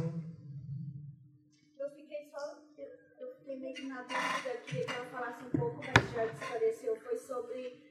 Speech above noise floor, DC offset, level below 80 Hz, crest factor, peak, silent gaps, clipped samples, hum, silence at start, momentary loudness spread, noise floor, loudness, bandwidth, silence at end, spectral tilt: 28 dB; under 0.1%; -64 dBFS; 32 dB; -6 dBFS; none; under 0.1%; none; 0 s; 18 LU; -65 dBFS; -37 LUFS; 14 kHz; 0 s; -5 dB/octave